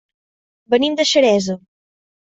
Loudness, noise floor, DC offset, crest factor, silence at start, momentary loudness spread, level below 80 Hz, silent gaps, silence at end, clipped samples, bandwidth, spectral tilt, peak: -16 LUFS; under -90 dBFS; under 0.1%; 16 dB; 0.7 s; 11 LU; -62 dBFS; none; 0.65 s; under 0.1%; 8.4 kHz; -3.5 dB/octave; -2 dBFS